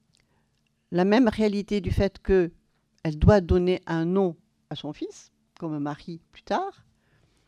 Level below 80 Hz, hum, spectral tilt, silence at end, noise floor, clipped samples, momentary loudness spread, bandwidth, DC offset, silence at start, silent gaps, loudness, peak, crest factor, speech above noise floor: -38 dBFS; none; -7.5 dB/octave; 0.75 s; -71 dBFS; under 0.1%; 17 LU; 11 kHz; under 0.1%; 0.9 s; none; -25 LUFS; -6 dBFS; 20 dB; 46 dB